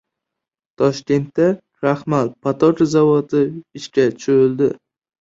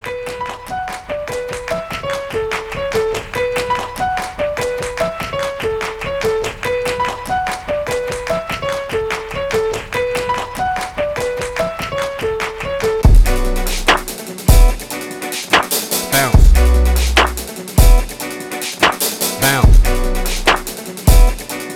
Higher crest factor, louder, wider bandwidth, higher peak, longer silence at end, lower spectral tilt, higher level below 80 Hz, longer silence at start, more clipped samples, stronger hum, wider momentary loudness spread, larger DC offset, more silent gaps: about the same, 16 dB vs 16 dB; about the same, -17 LUFS vs -17 LUFS; second, 7.8 kHz vs 17 kHz; about the same, -2 dBFS vs 0 dBFS; first, 0.45 s vs 0 s; first, -7 dB/octave vs -4 dB/octave; second, -58 dBFS vs -18 dBFS; first, 0.8 s vs 0.05 s; neither; neither; second, 7 LU vs 10 LU; neither; neither